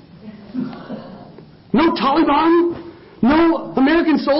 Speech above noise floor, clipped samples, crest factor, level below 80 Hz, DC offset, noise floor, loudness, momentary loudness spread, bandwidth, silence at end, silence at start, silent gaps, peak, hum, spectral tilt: 27 dB; under 0.1%; 14 dB; -46 dBFS; under 0.1%; -41 dBFS; -16 LUFS; 18 LU; 5.8 kHz; 0 s; 0.25 s; none; -4 dBFS; none; -10.5 dB/octave